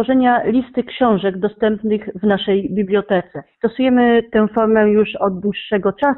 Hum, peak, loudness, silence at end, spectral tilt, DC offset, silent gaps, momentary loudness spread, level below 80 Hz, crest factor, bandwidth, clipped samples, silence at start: none; -4 dBFS; -17 LUFS; 0 s; -10 dB/octave; under 0.1%; none; 7 LU; -50 dBFS; 12 dB; 4.2 kHz; under 0.1%; 0 s